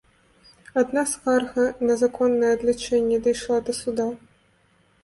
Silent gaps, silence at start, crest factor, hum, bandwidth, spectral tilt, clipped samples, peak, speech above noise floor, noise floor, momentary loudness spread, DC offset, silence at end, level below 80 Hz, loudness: none; 0.75 s; 16 dB; none; 11.5 kHz; -3.5 dB/octave; under 0.1%; -8 dBFS; 40 dB; -62 dBFS; 6 LU; under 0.1%; 0.9 s; -56 dBFS; -23 LUFS